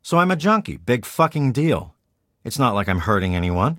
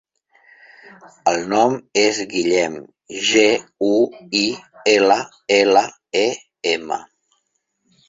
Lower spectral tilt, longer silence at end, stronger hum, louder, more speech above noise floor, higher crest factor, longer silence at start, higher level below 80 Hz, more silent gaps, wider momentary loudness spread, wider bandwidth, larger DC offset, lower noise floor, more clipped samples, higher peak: first, -6.5 dB/octave vs -2.5 dB/octave; second, 0 s vs 1.05 s; neither; about the same, -20 LUFS vs -18 LUFS; about the same, 50 dB vs 53 dB; about the same, 18 dB vs 18 dB; second, 0.05 s vs 1.05 s; first, -44 dBFS vs -62 dBFS; neither; second, 5 LU vs 9 LU; first, 17 kHz vs 8 kHz; neither; about the same, -69 dBFS vs -71 dBFS; neither; about the same, -4 dBFS vs -2 dBFS